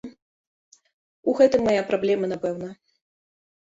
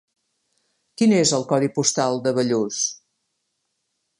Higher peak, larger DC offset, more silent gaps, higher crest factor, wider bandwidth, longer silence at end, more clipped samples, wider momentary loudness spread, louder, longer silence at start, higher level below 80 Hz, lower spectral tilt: second, -6 dBFS vs -2 dBFS; neither; first, 0.22-0.72 s, 0.93-1.23 s vs none; about the same, 20 dB vs 20 dB; second, 7.8 kHz vs 11.5 kHz; second, 0.95 s vs 1.25 s; neither; first, 17 LU vs 6 LU; about the same, -22 LUFS vs -20 LUFS; second, 0.05 s vs 1 s; first, -60 dBFS vs -68 dBFS; first, -6 dB/octave vs -4 dB/octave